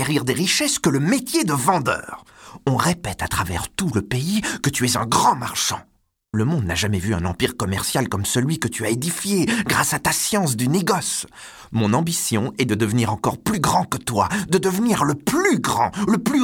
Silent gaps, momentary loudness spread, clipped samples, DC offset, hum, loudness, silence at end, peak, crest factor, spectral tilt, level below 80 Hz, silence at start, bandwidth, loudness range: none; 5 LU; under 0.1%; under 0.1%; none; -20 LUFS; 0 s; -4 dBFS; 16 dB; -4 dB/octave; -46 dBFS; 0 s; 19.5 kHz; 2 LU